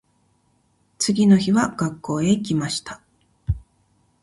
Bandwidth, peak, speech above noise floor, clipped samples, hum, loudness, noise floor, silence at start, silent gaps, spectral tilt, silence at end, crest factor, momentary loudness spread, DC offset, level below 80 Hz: 11.5 kHz; -4 dBFS; 45 dB; under 0.1%; none; -21 LUFS; -64 dBFS; 1 s; none; -5.5 dB/octave; 0.65 s; 18 dB; 16 LU; under 0.1%; -42 dBFS